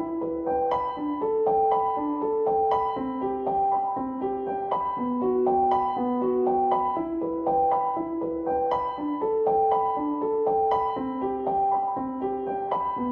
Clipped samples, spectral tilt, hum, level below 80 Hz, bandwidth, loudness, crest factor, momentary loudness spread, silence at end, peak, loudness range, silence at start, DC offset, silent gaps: under 0.1%; -9 dB/octave; none; -56 dBFS; 5.4 kHz; -26 LUFS; 14 dB; 6 LU; 0 s; -10 dBFS; 2 LU; 0 s; under 0.1%; none